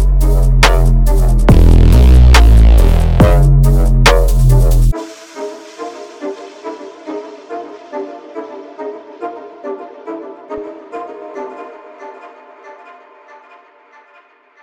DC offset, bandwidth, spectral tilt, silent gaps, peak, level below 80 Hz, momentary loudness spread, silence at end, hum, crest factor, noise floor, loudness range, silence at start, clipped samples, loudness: under 0.1%; 15.5 kHz; -6 dB/octave; none; 0 dBFS; -12 dBFS; 20 LU; 2.35 s; none; 12 dB; -47 dBFS; 21 LU; 0 s; under 0.1%; -10 LUFS